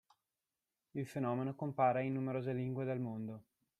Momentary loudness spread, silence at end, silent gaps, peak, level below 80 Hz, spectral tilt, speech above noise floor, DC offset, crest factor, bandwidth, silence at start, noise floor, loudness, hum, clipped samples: 13 LU; 0.4 s; none; -20 dBFS; -80 dBFS; -9 dB/octave; over 52 dB; under 0.1%; 20 dB; 12.5 kHz; 0.95 s; under -90 dBFS; -39 LUFS; none; under 0.1%